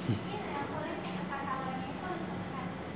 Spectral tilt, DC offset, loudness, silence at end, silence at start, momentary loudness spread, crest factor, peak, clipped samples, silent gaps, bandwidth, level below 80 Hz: -5.5 dB/octave; under 0.1%; -38 LUFS; 0 s; 0 s; 3 LU; 18 dB; -20 dBFS; under 0.1%; none; 4 kHz; -58 dBFS